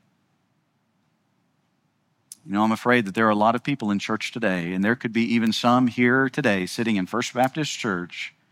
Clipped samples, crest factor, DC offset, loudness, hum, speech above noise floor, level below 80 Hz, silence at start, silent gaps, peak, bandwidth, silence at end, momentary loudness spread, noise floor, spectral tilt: under 0.1%; 20 dB; under 0.1%; -22 LUFS; none; 47 dB; -72 dBFS; 2.45 s; none; -4 dBFS; 15.5 kHz; 0.25 s; 7 LU; -69 dBFS; -5 dB/octave